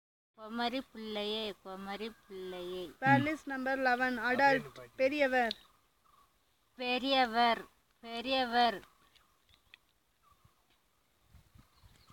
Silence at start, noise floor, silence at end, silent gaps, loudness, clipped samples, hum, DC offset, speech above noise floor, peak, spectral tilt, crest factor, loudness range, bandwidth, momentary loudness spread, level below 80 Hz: 0.4 s; -74 dBFS; 0.75 s; none; -33 LUFS; under 0.1%; none; under 0.1%; 41 dB; -12 dBFS; -5 dB/octave; 22 dB; 6 LU; 17 kHz; 16 LU; -70 dBFS